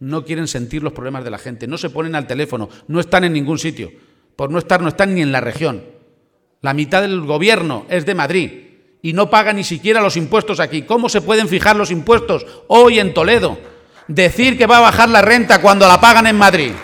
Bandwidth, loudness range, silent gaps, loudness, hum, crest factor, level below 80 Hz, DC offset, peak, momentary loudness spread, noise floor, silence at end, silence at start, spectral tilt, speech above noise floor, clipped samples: 18 kHz; 10 LU; none; -13 LUFS; none; 14 dB; -42 dBFS; under 0.1%; 0 dBFS; 17 LU; -60 dBFS; 0 s; 0 s; -4.5 dB/octave; 46 dB; 0.3%